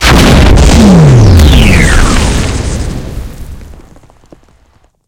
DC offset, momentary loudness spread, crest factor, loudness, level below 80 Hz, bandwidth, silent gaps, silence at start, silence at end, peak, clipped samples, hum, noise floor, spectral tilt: under 0.1%; 19 LU; 6 dB; -5 LUFS; -10 dBFS; 17 kHz; none; 0 s; 1.45 s; 0 dBFS; 9%; none; -47 dBFS; -5.5 dB/octave